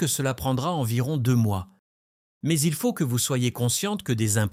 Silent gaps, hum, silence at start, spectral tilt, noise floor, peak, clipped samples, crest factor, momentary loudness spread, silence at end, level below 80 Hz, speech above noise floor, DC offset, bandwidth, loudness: 1.79-2.41 s; none; 0 s; -5 dB/octave; under -90 dBFS; -10 dBFS; under 0.1%; 14 dB; 4 LU; 0 s; -54 dBFS; over 66 dB; under 0.1%; 16.5 kHz; -25 LUFS